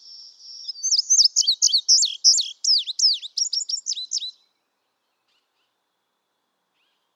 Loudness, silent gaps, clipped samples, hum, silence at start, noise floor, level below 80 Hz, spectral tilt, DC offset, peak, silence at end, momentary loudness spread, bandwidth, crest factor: -18 LUFS; none; under 0.1%; none; 0.05 s; -75 dBFS; under -90 dBFS; 9 dB/octave; under 0.1%; -6 dBFS; 2.85 s; 13 LU; 15 kHz; 18 dB